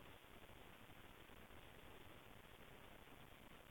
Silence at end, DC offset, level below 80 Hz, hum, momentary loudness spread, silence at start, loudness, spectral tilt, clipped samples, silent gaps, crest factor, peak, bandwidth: 0 s; under 0.1%; -72 dBFS; none; 1 LU; 0 s; -62 LUFS; -4 dB/octave; under 0.1%; none; 14 dB; -48 dBFS; 17 kHz